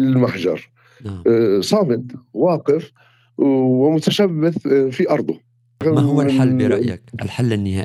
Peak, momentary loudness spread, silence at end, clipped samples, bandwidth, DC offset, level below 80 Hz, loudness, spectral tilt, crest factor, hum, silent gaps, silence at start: -2 dBFS; 12 LU; 0 s; under 0.1%; 13.5 kHz; under 0.1%; -58 dBFS; -18 LUFS; -7 dB/octave; 16 dB; none; none; 0 s